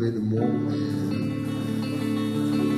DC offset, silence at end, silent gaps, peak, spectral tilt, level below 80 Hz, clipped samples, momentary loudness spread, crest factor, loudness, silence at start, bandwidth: under 0.1%; 0 s; none; -10 dBFS; -7.5 dB/octave; -58 dBFS; under 0.1%; 4 LU; 14 dB; -26 LUFS; 0 s; 14 kHz